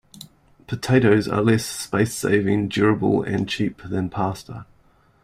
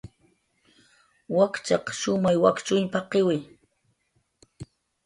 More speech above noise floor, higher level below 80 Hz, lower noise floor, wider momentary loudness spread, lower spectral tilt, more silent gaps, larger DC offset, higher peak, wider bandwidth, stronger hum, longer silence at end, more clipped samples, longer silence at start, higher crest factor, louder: second, 37 dB vs 48 dB; first, -52 dBFS vs -62 dBFS; second, -57 dBFS vs -71 dBFS; second, 12 LU vs 25 LU; about the same, -6 dB/octave vs -5 dB/octave; neither; neither; about the same, -4 dBFS vs -6 dBFS; first, 16 kHz vs 11.5 kHz; neither; first, 0.6 s vs 0.4 s; neither; first, 0.2 s vs 0.05 s; about the same, 18 dB vs 20 dB; first, -21 LUFS vs -24 LUFS